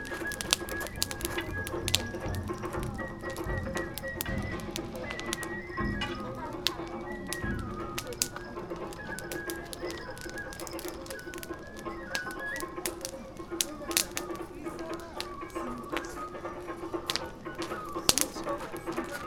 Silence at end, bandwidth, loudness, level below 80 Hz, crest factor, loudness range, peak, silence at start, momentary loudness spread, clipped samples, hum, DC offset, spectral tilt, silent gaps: 0 s; 19 kHz; -34 LUFS; -48 dBFS; 34 dB; 5 LU; 0 dBFS; 0 s; 11 LU; under 0.1%; none; under 0.1%; -3 dB/octave; none